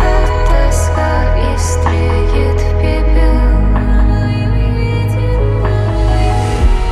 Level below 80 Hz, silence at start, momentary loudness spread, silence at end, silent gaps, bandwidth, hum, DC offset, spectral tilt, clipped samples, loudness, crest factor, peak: -12 dBFS; 0 s; 2 LU; 0 s; none; 12 kHz; none; under 0.1%; -6.5 dB/octave; under 0.1%; -14 LUFS; 10 dB; 0 dBFS